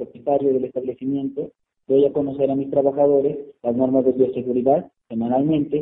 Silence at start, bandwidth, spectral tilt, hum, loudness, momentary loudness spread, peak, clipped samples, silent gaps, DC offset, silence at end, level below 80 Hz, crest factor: 0 s; 3.8 kHz; -12.5 dB/octave; none; -21 LUFS; 9 LU; -6 dBFS; under 0.1%; none; under 0.1%; 0 s; -60 dBFS; 16 dB